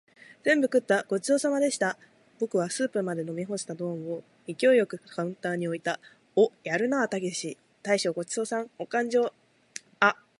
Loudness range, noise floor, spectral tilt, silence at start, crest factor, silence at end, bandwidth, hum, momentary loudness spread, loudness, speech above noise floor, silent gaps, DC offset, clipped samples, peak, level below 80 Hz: 2 LU; -47 dBFS; -4.5 dB/octave; 0.3 s; 22 dB; 0.25 s; 11.5 kHz; none; 12 LU; -28 LUFS; 20 dB; none; under 0.1%; under 0.1%; -6 dBFS; -80 dBFS